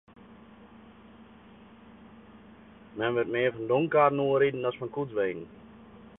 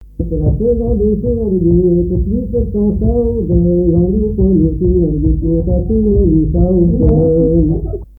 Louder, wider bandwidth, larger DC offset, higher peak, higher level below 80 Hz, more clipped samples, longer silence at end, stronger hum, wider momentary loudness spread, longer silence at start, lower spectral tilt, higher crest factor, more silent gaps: second, -27 LUFS vs -13 LUFS; first, 3.9 kHz vs 1.3 kHz; neither; second, -10 dBFS vs 0 dBFS; second, -66 dBFS vs -18 dBFS; neither; about the same, 0.1 s vs 0.15 s; neither; first, 13 LU vs 5 LU; first, 0.3 s vs 0 s; second, -10 dB/octave vs -15 dB/octave; first, 22 dB vs 12 dB; neither